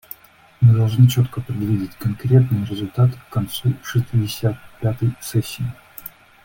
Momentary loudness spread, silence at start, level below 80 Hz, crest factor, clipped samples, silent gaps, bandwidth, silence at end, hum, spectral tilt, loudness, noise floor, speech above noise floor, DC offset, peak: 15 LU; 0.6 s; -48 dBFS; 16 dB; under 0.1%; none; 17 kHz; 0.35 s; none; -7 dB/octave; -20 LUFS; -49 dBFS; 30 dB; under 0.1%; -2 dBFS